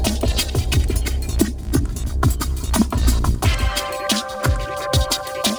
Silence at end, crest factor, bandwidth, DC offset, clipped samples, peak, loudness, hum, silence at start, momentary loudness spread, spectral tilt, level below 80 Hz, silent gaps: 0 s; 18 dB; over 20 kHz; under 0.1%; under 0.1%; -2 dBFS; -21 LUFS; none; 0 s; 4 LU; -4.5 dB/octave; -22 dBFS; none